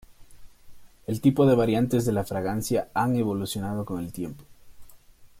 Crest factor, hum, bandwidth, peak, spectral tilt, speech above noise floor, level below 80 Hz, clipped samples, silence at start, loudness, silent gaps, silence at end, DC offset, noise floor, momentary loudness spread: 18 dB; none; 16.5 kHz; -8 dBFS; -6.5 dB/octave; 26 dB; -54 dBFS; under 0.1%; 0.2 s; -25 LUFS; none; 0.15 s; under 0.1%; -51 dBFS; 14 LU